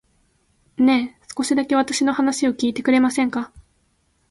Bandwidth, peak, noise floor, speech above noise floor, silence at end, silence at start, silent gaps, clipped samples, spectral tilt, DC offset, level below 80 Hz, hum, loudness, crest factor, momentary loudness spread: 11.5 kHz; -6 dBFS; -65 dBFS; 46 dB; 0.7 s; 0.8 s; none; under 0.1%; -3 dB/octave; under 0.1%; -58 dBFS; none; -20 LUFS; 16 dB; 11 LU